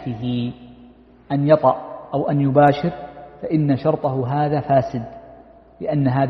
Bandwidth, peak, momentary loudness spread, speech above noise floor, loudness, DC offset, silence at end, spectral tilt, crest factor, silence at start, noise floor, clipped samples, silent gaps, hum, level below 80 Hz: 6 kHz; 0 dBFS; 15 LU; 29 dB; -20 LUFS; under 0.1%; 0 s; -10 dB/octave; 18 dB; 0 s; -47 dBFS; under 0.1%; none; none; -52 dBFS